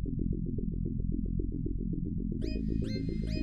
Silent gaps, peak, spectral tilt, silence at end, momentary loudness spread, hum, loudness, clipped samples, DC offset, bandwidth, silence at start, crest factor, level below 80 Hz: none; -20 dBFS; -9 dB/octave; 0 s; 2 LU; none; -35 LUFS; under 0.1%; under 0.1%; 7.2 kHz; 0 s; 12 dB; -36 dBFS